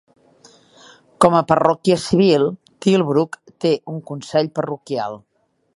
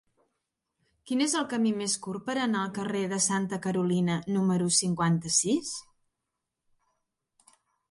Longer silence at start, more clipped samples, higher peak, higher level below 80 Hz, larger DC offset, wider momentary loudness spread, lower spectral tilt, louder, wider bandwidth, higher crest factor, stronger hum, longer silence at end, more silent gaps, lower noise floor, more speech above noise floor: first, 1.2 s vs 1.05 s; neither; first, 0 dBFS vs -10 dBFS; first, -56 dBFS vs -68 dBFS; neither; first, 11 LU vs 7 LU; first, -6 dB/octave vs -4 dB/octave; first, -18 LUFS vs -28 LUFS; about the same, 11.5 kHz vs 11.5 kHz; about the same, 18 dB vs 20 dB; neither; second, 0.6 s vs 2.1 s; neither; second, -51 dBFS vs -85 dBFS; second, 34 dB vs 57 dB